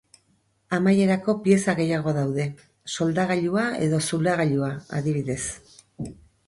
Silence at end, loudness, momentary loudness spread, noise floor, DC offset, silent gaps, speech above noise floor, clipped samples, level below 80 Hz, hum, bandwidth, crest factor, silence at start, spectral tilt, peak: 0.35 s; -24 LUFS; 15 LU; -66 dBFS; under 0.1%; none; 43 dB; under 0.1%; -56 dBFS; none; 11.5 kHz; 18 dB; 0.7 s; -6 dB/octave; -6 dBFS